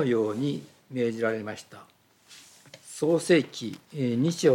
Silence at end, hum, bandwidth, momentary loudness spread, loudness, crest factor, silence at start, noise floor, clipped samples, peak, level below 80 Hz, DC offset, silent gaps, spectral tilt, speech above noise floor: 0 s; none; 16.5 kHz; 19 LU; -28 LUFS; 18 dB; 0 s; -54 dBFS; under 0.1%; -8 dBFS; -80 dBFS; under 0.1%; none; -5.5 dB/octave; 28 dB